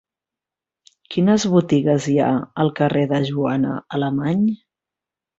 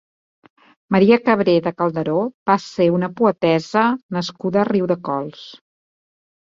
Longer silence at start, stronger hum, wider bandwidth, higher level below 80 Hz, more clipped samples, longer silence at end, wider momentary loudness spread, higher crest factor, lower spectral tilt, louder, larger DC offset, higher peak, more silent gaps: first, 1.1 s vs 0.9 s; neither; about the same, 8 kHz vs 7.6 kHz; about the same, -58 dBFS vs -60 dBFS; neither; second, 0.85 s vs 1 s; second, 6 LU vs 10 LU; about the same, 16 dB vs 18 dB; about the same, -6.5 dB/octave vs -7 dB/octave; about the same, -19 LUFS vs -18 LUFS; neither; about the same, -4 dBFS vs -2 dBFS; second, none vs 2.34-2.46 s, 4.03-4.09 s